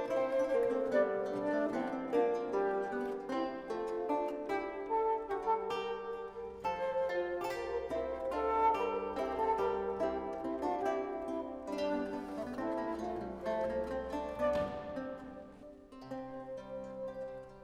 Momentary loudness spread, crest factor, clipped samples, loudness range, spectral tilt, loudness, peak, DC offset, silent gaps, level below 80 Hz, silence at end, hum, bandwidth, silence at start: 12 LU; 18 dB; under 0.1%; 4 LU; -6 dB/octave; -36 LUFS; -18 dBFS; under 0.1%; none; -60 dBFS; 0 s; none; 16 kHz; 0 s